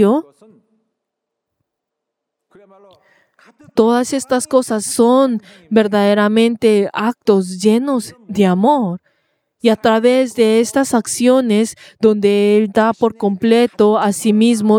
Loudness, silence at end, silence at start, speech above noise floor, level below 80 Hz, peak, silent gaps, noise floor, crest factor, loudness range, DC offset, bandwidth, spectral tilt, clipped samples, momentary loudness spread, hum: -14 LUFS; 0 s; 0 s; 65 dB; -60 dBFS; 0 dBFS; none; -79 dBFS; 14 dB; 6 LU; under 0.1%; 16 kHz; -5 dB/octave; under 0.1%; 6 LU; none